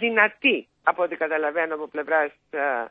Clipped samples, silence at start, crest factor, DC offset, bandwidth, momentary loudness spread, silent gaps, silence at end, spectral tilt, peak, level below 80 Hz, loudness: under 0.1%; 0 s; 20 dB; under 0.1%; 4.7 kHz; 8 LU; none; 0 s; -7 dB/octave; -4 dBFS; -76 dBFS; -23 LUFS